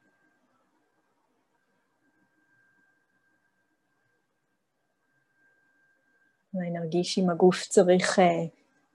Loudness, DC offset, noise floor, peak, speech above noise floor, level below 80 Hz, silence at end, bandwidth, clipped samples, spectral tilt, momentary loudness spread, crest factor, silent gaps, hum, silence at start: -24 LUFS; under 0.1%; -78 dBFS; -8 dBFS; 54 dB; -78 dBFS; 0.45 s; 11.5 kHz; under 0.1%; -5 dB/octave; 14 LU; 22 dB; none; none; 6.55 s